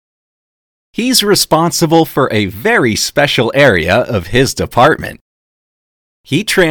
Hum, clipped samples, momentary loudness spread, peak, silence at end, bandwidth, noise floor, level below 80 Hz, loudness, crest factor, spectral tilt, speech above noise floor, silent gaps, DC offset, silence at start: none; 0.5%; 8 LU; 0 dBFS; 0 s; over 20 kHz; under -90 dBFS; -38 dBFS; -11 LUFS; 12 dB; -4 dB/octave; over 79 dB; 5.21-6.24 s; under 0.1%; 1 s